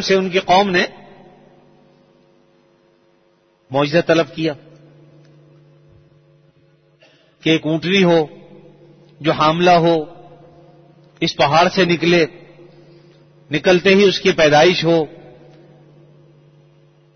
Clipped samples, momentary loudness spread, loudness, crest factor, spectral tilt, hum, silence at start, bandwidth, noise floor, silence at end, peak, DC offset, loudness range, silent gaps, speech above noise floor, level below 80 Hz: under 0.1%; 11 LU; -15 LUFS; 16 dB; -5.5 dB/octave; none; 0 s; 6.6 kHz; -58 dBFS; 2.1 s; -2 dBFS; under 0.1%; 9 LU; none; 43 dB; -54 dBFS